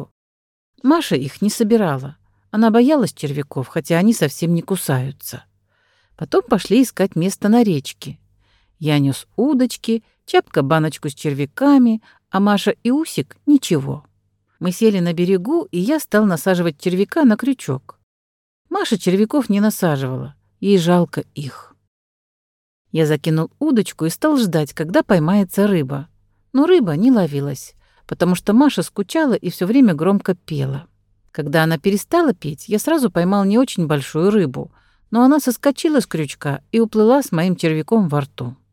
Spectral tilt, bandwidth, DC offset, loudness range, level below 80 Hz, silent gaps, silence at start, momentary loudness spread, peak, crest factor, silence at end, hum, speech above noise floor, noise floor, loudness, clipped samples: -6 dB/octave; 17.5 kHz; under 0.1%; 3 LU; -56 dBFS; 0.11-0.73 s, 18.03-18.65 s, 21.88-22.85 s; 0 s; 12 LU; -2 dBFS; 16 dB; 0.2 s; none; 48 dB; -64 dBFS; -17 LUFS; under 0.1%